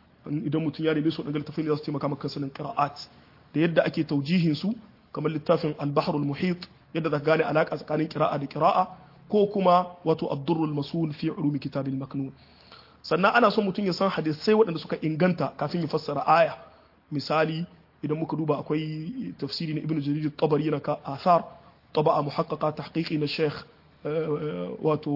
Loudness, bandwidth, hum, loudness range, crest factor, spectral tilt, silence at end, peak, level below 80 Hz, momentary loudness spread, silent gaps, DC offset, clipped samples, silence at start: -27 LUFS; 5.8 kHz; none; 4 LU; 20 dB; -8 dB/octave; 0 s; -6 dBFS; -66 dBFS; 11 LU; none; under 0.1%; under 0.1%; 0.25 s